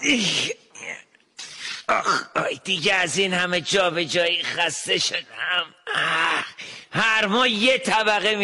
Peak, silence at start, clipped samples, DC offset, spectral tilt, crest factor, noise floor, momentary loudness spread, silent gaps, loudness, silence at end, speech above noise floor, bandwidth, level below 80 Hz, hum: -8 dBFS; 0 s; under 0.1%; under 0.1%; -2 dB/octave; 14 dB; -43 dBFS; 15 LU; none; -21 LUFS; 0 s; 21 dB; 11.5 kHz; -62 dBFS; none